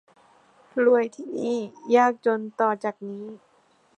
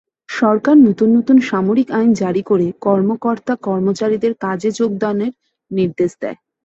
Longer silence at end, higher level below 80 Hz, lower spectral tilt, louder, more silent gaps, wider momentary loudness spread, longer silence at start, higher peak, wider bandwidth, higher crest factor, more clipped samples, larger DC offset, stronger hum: first, 0.6 s vs 0.3 s; second, -82 dBFS vs -58 dBFS; second, -5.5 dB/octave vs -7 dB/octave; second, -24 LUFS vs -16 LUFS; neither; first, 16 LU vs 9 LU; first, 0.75 s vs 0.3 s; second, -6 dBFS vs -2 dBFS; first, 8.8 kHz vs 7.8 kHz; about the same, 18 dB vs 14 dB; neither; neither; neither